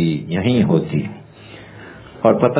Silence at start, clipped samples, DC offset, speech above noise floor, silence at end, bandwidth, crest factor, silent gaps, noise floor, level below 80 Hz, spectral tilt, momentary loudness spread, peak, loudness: 0 s; under 0.1%; under 0.1%; 24 dB; 0 s; 4 kHz; 18 dB; none; -40 dBFS; -46 dBFS; -12 dB/octave; 23 LU; 0 dBFS; -18 LUFS